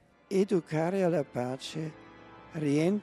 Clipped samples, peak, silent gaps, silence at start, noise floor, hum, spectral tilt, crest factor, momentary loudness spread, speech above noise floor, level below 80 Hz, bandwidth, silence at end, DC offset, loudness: under 0.1%; -16 dBFS; none; 0.3 s; -52 dBFS; none; -7 dB/octave; 16 dB; 12 LU; 22 dB; -70 dBFS; 13 kHz; 0 s; under 0.1%; -31 LUFS